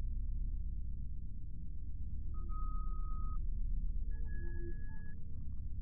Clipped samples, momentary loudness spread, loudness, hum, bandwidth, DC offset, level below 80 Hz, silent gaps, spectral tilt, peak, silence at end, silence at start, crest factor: under 0.1%; 6 LU; -46 LUFS; none; 1.8 kHz; under 0.1%; -40 dBFS; none; -7.5 dB/octave; -26 dBFS; 0 s; 0 s; 10 dB